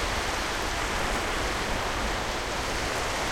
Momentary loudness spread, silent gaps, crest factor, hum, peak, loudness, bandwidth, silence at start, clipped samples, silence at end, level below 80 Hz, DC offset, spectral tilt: 2 LU; none; 14 dB; none; -14 dBFS; -28 LUFS; 16.5 kHz; 0 s; under 0.1%; 0 s; -36 dBFS; under 0.1%; -3 dB/octave